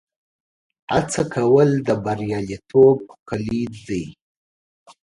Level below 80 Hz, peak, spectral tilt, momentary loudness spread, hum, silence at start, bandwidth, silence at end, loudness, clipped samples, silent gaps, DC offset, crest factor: -50 dBFS; -4 dBFS; -6.5 dB/octave; 14 LU; none; 0.9 s; 11 kHz; 0.9 s; -20 LUFS; under 0.1%; 3.20-3.26 s; under 0.1%; 18 dB